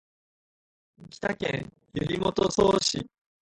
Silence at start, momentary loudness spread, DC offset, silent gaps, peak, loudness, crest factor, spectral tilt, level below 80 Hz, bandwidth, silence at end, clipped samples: 1 s; 13 LU; under 0.1%; none; -8 dBFS; -27 LUFS; 20 dB; -4.5 dB/octave; -54 dBFS; 11 kHz; 0.4 s; under 0.1%